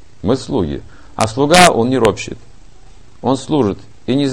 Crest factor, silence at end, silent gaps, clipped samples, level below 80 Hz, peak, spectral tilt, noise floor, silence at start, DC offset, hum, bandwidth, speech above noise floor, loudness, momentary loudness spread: 16 dB; 0 s; none; 0.2%; -38 dBFS; 0 dBFS; -4.5 dB/octave; -43 dBFS; 0.25 s; 2%; none; 16 kHz; 29 dB; -14 LUFS; 19 LU